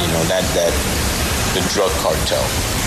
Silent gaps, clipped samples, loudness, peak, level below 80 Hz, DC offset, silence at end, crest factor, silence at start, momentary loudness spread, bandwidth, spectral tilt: none; under 0.1%; -17 LUFS; -6 dBFS; -28 dBFS; under 0.1%; 0 s; 12 dB; 0 s; 2 LU; 14 kHz; -3.5 dB/octave